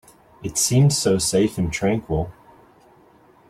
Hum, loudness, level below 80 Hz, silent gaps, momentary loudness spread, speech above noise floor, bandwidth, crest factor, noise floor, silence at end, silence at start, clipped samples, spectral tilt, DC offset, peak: none; -20 LUFS; -44 dBFS; none; 10 LU; 33 dB; 15.5 kHz; 16 dB; -53 dBFS; 1.2 s; 0.4 s; under 0.1%; -4.5 dB/octave; under 0.1%; -6 dBFS